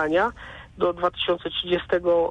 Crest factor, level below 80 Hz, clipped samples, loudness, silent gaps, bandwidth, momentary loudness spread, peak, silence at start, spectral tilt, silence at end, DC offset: 14 dB; -50 dBFS; under 0.1%; -24 LUFS; none; 7.4 kHz; 7 LU; -10 dBFS; 0 s; -6 dB/octave; 0 s; under 0.1%